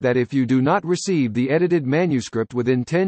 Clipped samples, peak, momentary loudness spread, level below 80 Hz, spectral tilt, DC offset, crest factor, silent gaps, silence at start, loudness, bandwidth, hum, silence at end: under 0.1%; -6 dBFS; 4 LU; -62 dBFS; -6.5 dB/octave; under 0.1%; 12 dB; none; 0 s; -20 LUFS; 8.6 kHz; none; 0 s